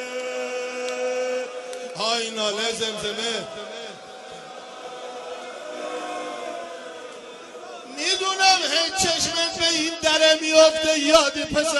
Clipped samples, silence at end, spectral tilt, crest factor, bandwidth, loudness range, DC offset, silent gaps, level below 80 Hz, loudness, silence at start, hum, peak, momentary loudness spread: under 0.1%; 0 s; -1 dB/octave; 22 dB; 11.5 kHz; 16 LU; under 0.1%; none; -56 dBFS; -21 LUFS; 0 s; none; -2 dBFS; 21 LU